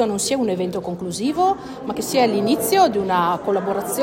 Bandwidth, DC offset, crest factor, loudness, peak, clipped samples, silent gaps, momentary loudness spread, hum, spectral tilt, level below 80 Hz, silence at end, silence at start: 16.5 kHz; under 0.1%; 16 dB; -20 LUFS; -4 dBFS; under 0.1%; none; 10 LU; none; -4 dB/octave; -54 dBFS; 0 s; 0 s